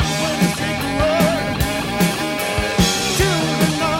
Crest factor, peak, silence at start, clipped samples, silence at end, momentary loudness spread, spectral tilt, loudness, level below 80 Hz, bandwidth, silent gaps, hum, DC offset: 16 dB; -2 dBFS; 0 s; under 0.1%; 0 s; 4 LU; -4 dB/octave; -18 LUFS; -32 dBFS; 17 kHz; none; none; under 0.1%